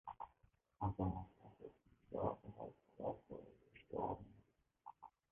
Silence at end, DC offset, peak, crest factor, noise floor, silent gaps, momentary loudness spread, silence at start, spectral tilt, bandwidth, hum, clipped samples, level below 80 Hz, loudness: 0.2 s; under 0.1%; -26 dBFS; 22 dB; -77 dBFS; none; 18 LU; 0.05 s; -7.5 dB/octave; 3.6 kHz; none; under 0.1%; -64 dBFS; -48 LUFS